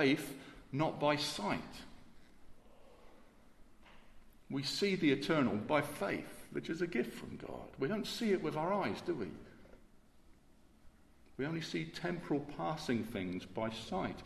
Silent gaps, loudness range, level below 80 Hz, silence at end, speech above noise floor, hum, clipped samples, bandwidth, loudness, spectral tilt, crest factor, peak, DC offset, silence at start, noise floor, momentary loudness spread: none; 8 LU; -64 dBFS; 0 s; 27 dB; none; under 0.1%; 13.5 kHz; -37 LUFS; -5.5 dB/octave; 22 dB; -18 dBFS; under 0.1%; 0 s; -64 dBFS; 14 LU